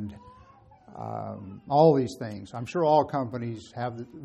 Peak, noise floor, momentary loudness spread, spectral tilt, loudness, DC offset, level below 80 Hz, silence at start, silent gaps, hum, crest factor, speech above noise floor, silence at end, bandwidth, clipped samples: -8 dBFS; -54 dBFS; 18 LU; -7.5 dB/octave; -27 LUFS; under 0.1%; -62 dBFS; 0 s; none; none; 20 dB; 28 dB; 0 s; 12 kHz; under 0.1%